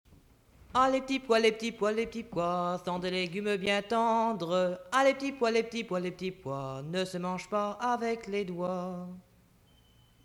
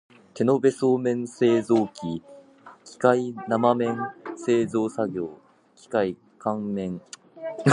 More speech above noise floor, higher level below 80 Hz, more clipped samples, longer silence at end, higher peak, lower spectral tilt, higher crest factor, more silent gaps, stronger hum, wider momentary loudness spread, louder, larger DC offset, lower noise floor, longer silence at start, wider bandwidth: first, 32 dB vs 26 dB; about the same, -64 dBFS vs -66 dBFS; neither; first, 1.05 s vs 0 s; second, -12 dBFS vs -4 dBFS; second, -5 dB/octave vs -6.5 dB/octave; about the same, 18 dB vs 20 dB; neither; neither; about the same, 10 LU vs 12 LU; second, -31 LUFS vs -25 LUFS; neither; first, -63 dBFS vs -49 dBFS; first, 0.75 s vs 0.35 s; first, 15 kHz vs 11 kHz